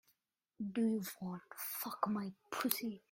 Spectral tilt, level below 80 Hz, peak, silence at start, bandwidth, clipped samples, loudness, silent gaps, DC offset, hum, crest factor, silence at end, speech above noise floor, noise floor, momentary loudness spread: -4.5 dB/octave; -82 dBFS; -12 dBFS; 0.6 s; 16.5 kHz; under 0.1%; -40 LUFS; none; under 0.1%; none; 28 dB; 0.15 s; 42 dB; -82 dBFS; 9 LU